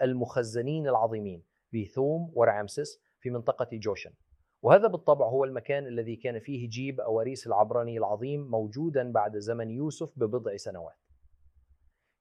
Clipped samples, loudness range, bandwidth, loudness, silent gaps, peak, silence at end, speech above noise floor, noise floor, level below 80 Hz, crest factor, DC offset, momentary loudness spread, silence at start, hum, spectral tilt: under 0.1%; 5 LU; 11.5 kHz; -29 LUFS; none; -6 dBFS; 1.3 s; 38 dB; -66 dBFS; -70 dBFS; 24 dB; under 0.1%; 13 LU; 0 s; none; -7 dB/octave